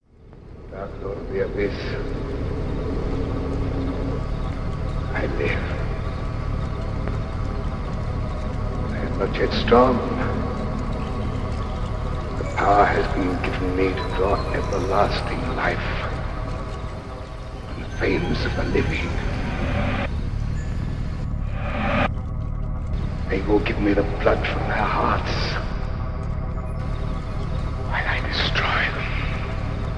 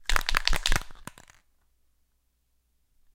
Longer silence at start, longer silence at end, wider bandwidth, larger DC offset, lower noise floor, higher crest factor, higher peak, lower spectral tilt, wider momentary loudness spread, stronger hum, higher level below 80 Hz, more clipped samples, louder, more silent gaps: about the same, 0.2 s vs 0.1 s; second, 0 s vs 2.2 s; second, 10.5 kHz vs 17 kHz; neither; second, -44 dBFS vs -72 dBFS; second, 20 dB vs 28 dB; about the same, -2 dBFS vs 0 dBFS; first, -7 dB/octave vs -1.5 dB/octave; second, 8 LU vs 21 LU; neither; about the same, -28 dBFS vs -32 dBFS; neither; about the same, -25 LUFS vs -27 LUFS; neither